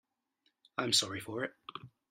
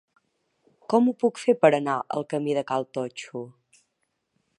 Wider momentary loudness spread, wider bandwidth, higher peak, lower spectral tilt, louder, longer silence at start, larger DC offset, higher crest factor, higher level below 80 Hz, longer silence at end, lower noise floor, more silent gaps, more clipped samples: first, 19 LU vs 16 LU; first, 16 kHz vs 11 kHz; second, -14 dBFS vs -4 dBFS; second, -2 dB/octave vs -6 dB/octave; second, -33 LUFS vs -24 LUFS; about the same, 0.8 s vs 0.9 s; neither; about the same, 24 dB vs 22 dB; about the same, -76 dBFS vs -76 dBFS; second, 0.25 s vs 1.1 s; about the same, -79 dBFS vs -77 dBFS; neither; neither